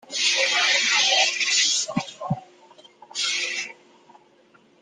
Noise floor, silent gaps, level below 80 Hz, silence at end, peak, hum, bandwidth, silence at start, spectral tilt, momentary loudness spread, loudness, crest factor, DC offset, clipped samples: -57 dBFS; none; -70 dBFS; 1.1 s; -8 dBFS; none; 14 kHz; 0.1 s; -0.5 dB/octave; 14 LU; -20 LUFS; 18 dB; under 0.1%; under 0.1%